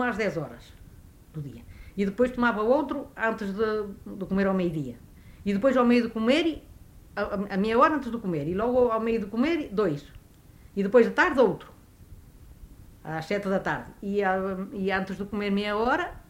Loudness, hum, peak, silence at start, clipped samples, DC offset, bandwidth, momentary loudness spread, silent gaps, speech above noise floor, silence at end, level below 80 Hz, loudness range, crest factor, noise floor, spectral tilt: -26 LUFS; none; -8 dBFS; 0 s; under 0.1%; under 0.1%; 16 kHz; 16 LU; none; 26 dB; 0.05 s; -52 dBFS; 4 LU; 20 dB; -52 dBFS; -7 dB/octave